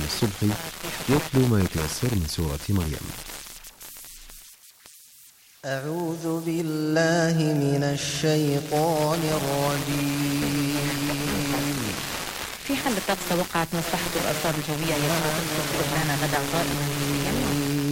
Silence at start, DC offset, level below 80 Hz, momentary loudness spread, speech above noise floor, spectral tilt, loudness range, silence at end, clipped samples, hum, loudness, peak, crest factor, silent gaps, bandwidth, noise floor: 0 s; under 0.1%; -44 dBFS; 9 LU; 28 dB; -4.5 dB/octave; 9 LU; 0 s; under 0.1%; none; -25 LUFS; -10 dBFS; 16 dB; none; 17 kHz; -52 dBFS